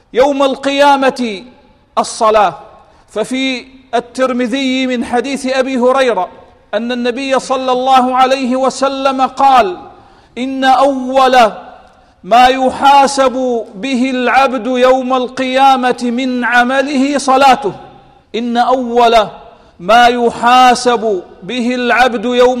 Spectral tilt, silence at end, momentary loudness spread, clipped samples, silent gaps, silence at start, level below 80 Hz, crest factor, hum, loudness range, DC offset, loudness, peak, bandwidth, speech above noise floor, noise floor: -3.5 dB/octave; 0 s; 12 LU; under 0.1%; none; 0.15 s; -46 dBFS; 12 dB; none; 4 LU; under 0.1%; -11 LUFS; 0 dBFS; 15 kHz; 30 dB; -41 dBFS